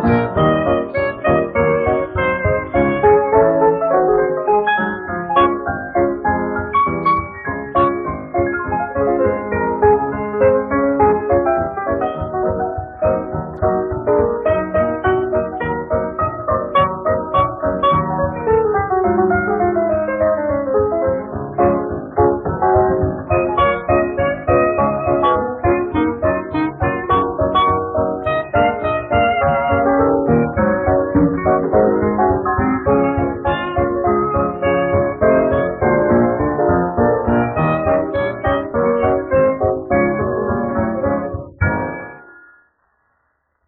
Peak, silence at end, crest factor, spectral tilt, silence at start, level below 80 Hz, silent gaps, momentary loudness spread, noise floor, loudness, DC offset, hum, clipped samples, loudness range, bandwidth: 0 dBFS; 1.35 s; 16 dB; -6 dB/octave; 0 s; -36 dBFS; none; 6 LU; -66 dBFS; -17 LUFS; under 0.1%; none; under 0.1%; 3 LU; 4.8 kHz